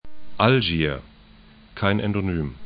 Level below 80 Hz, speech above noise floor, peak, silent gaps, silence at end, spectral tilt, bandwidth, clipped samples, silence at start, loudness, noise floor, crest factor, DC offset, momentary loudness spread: -42 dBFS; 28 dB; -2 dBFS; none; 0 s; -11 dB/octave; 5.2 kHz; under 0.1%; 0 s; -22 LUFS; -49 dBFS; 22 dB; under 0.1%; 11 LU